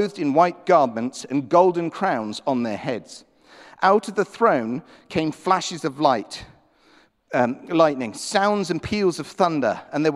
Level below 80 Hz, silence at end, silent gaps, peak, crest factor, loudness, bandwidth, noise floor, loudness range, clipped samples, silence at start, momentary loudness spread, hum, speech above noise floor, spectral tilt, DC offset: -58 dBFS; 0 s; none; -4 dBFS; 18 dB; -22 LUFS; 13 kHz; -57 dBFS; 2 LU; under 0.1%; 0 s; 10 LU; none; 35 dB; -5 dB/octave; under 0.1%